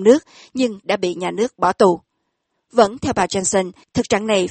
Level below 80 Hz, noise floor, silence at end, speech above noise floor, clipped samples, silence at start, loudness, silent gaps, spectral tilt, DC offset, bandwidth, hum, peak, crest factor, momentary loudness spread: -52 dBFS; -73 dBFS; 0 s; 55 dB; under 0.1%; 0 s; -19 LUFS; none; -4 dB/octave; under 0.1%; 8.8 kHz; none; 0 dBFS; 18 dB; 8 LU